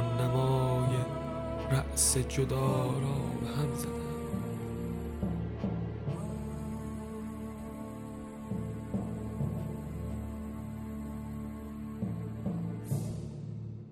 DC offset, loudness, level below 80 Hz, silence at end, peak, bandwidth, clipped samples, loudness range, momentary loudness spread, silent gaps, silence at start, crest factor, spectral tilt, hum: under 0.1%; -35 LUFS; -46 dBFS; 0 s; -14 dBFS; 16 kHz; under 0.1%; 9 LU; 13 LU; none; 0 s; 20 dB; -5.5 dB/octave; none